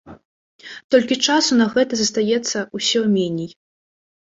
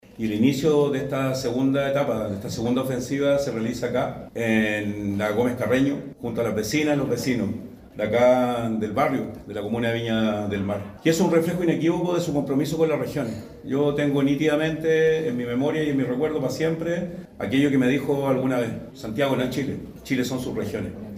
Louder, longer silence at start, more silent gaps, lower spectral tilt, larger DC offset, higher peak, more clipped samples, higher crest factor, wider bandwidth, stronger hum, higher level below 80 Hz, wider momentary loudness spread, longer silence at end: first, -18 LUFS vs -24 LUFS; about the same, 0.05 s vs 0.1 s; first, 0.25-0.59 s, 0.84-0.89 s vs none; second, -3.5 dB/octave vs -6 dB/octave; neither; first, -2 dBFS vs -6 dBFS; neither; about the same, 18 dB vs 16 dB; second, 8 kHz vs 15.5 kHz; neither; second, -62 dBFS vs -52 dBFS; first, 13 LU vs 9 LU; first, 0.75 s vs 0 s